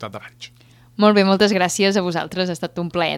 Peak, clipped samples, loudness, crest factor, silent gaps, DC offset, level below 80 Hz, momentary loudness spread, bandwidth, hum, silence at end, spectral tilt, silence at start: -2 dBFS; under 0.1%; -18 LUFS; 18 dB; none; under 0.1%; -58 dBFS; 20 LU; 14 kHz; none; 0 s; -4.5 dB/octave; 0 s